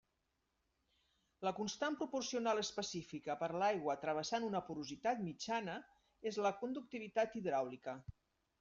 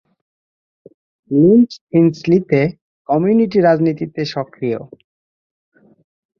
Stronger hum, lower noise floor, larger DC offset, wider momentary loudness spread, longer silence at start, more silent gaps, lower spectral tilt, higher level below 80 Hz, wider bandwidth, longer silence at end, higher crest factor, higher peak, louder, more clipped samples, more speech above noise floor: neither; second, -85 dBFS vs under -90 dBFS; neither; about the same, 10 LU vs 11 LU; about the same, 1.4 s vs 1.3 s; second, none vs 1.81-1.87 s, 2.82-3.05 s; second, -3.5 dB/octave vs -8.5 dB/octave; second, -74 dBFS vs -56 dBFS; first, 7.8 kHz vs 6.8 kHz; second, 0.5 s vs 1.55 s; about the same, 18 dB vs 16 dB; second, -24 dBFS vs -2 dBFS; second, -41 LUFS vs -15 LUFS; neither; second, 44 dB vs over 76 dB